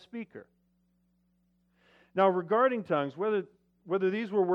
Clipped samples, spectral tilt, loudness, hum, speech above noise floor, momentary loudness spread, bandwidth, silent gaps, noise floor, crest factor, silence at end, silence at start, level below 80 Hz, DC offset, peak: under 0.1%; -8.5 dB/octave; -29 LUFS; 60 Hz at -65 dBFS; 43 dB; 16 LU; 5.8 kHz; none; -72 dBFS; 20 dB; 0 s; 0.15 s; -80 dBFS; under 0.1%; -12 dBFS